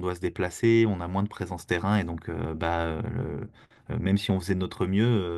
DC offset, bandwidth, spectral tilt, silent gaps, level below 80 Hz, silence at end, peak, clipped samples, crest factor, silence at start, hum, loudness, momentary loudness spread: under 0.1%; 12.5 kHz; -7 dB/octave; none; -50 dBFS; 0 s; -10 dBFS; under 0.1%; 16 dB; 0 s; none; -27 LUFS; 10 LU